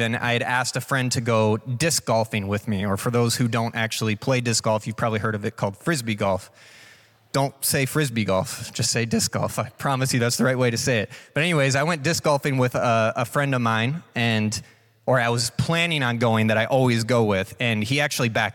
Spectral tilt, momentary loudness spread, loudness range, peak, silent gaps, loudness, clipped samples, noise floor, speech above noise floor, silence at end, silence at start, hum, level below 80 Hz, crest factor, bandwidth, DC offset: -4.5 dB/octave; 5 LU; 3 LU; -8 dBFS; none; -22 LUFS; under 0.1%; -52 dBFS; 30 dB; 0 s; 0 s; none; -60 dBFS; 14 dB; 18 kHz; under 0.1%